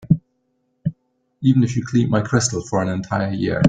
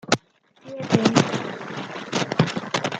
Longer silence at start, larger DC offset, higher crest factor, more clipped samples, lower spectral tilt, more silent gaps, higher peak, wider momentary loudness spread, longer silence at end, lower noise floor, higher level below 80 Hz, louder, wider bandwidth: about the same, 0 s vs 0.1 s; neither; second, 18 dB vs 24 dB; neither; about the same, -6 dB/octave vs -5 dB/octave; neither; about the same, -2 dBFS vs 0 dBFS; about the same, 11 LU vs 13 LU; about the same, 0 s vs 0 s; first, -68 dBFS vs -54 dBFS; first, -50 dBFS vs -60 dBFS; first, -20 LUFS vs -23 LUFS; second, 9.4 kHz vs 11 kHz